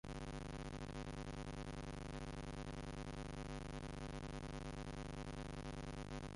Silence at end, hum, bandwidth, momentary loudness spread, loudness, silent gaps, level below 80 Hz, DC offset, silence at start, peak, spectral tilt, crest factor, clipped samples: 0 s; none; 11.5 kHz; 0 LU; -49 LUFS; none; -54 dBFS; under 0.1%; 0.05 s; -36 dBFS; -5.5 dB/octave; 12 dB; under 0.1%